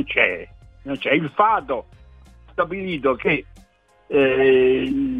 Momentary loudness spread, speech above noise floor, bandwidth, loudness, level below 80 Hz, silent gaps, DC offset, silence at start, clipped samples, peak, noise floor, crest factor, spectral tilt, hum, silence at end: 14 LU; 27 dB; 4.7 kHz; -20 LUFS; -48 dBFS; none; under 0.1%; 0 s; under 0.1%; -2 dBFS; -47 dBFS; 20 dB; -7.5 dB/octave; none; 0 s